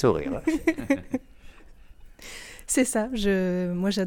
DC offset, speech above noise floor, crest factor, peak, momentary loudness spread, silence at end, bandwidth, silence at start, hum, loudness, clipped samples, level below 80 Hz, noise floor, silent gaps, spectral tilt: under 0.1%; 23 dB; 18 dB; -8 dBFS; 16 LU; 0 s; 19 kHz; 0 s; none; -26 LUFS; under 0.1%; -46 dBFS; -48 dBFS; none; -5 dB/octave